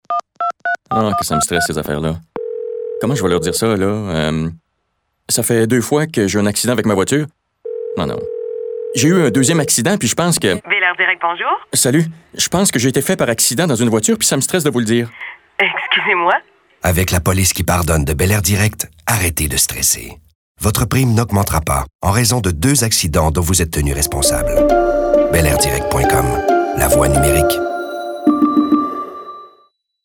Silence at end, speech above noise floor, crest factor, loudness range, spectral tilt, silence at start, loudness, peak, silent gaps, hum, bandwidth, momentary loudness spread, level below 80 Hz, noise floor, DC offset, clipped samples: 0.55 s; 54 dB; 16 dB; 4 LU; -4 dB/octave; 0.1 s; -15 LUFS; 0 dBFS; 20.35-20.55 s, 21.95-21.99 s; none; over 20 kHz; 10 LU; -30 dBFS; -69 dBFS; under 0.1%; under 0.1%